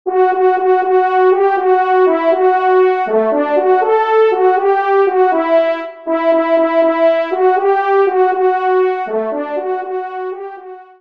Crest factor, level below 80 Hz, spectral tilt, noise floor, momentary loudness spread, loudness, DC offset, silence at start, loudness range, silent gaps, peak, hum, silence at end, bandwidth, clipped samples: 12 dB; -68 dBFS; -6.5 dB/octave; -33 dBFS; 8 LU; -13 LUFS; 0.3%; 0.05 s; 3 LU; none; -2 dBFS; none; 0.15 s; 5.2 kHz; under 0.1%